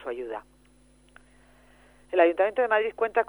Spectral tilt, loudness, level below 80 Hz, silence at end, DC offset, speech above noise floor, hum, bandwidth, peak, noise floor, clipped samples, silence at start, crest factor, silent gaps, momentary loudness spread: -5 dB/octave; -25 LUFS; -62 dBFS; 0.05 s; under 0.1%; 34 dB; none; 10.5 kHz; -6 dBFS; -59 dBFS; under 0.1%; 0 s; 20 dB; none; 15 LU